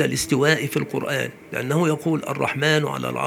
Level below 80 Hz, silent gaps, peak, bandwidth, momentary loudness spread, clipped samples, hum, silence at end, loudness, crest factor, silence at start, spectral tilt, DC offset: -56 dBFS; none; -2 dBFS; 20 kHz; 7 LU; under 0.1%; none; 0 s; -22 LUFS; 20 dB; 0 s; -4.5 dB/octave; under 0.1%